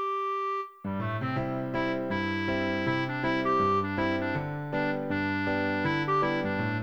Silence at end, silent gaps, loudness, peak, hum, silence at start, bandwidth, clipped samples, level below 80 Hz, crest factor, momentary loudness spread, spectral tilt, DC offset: 0 s; none; -29 LUFS; -16 dBFS; none; 0 s; over 20 kHz; under 0.1%; -56 dBFS; 14 dB; 6 LU; -7.5 dB/octave; 0.2%